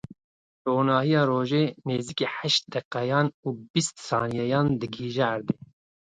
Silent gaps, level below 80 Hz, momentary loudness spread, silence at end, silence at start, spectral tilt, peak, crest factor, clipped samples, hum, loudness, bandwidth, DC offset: 0.24-0.65 s, 2.85-2.91 s, 3.34-3.43 s, 3.70-3.74 s; -62 dBFS; 8 LU; 0.55 s; 0.1 s; -5 dB/octave; -8 dBFS; 18 dB; under 0.1%; none; -26 LUFS; 9.4 kHz; under 0.1%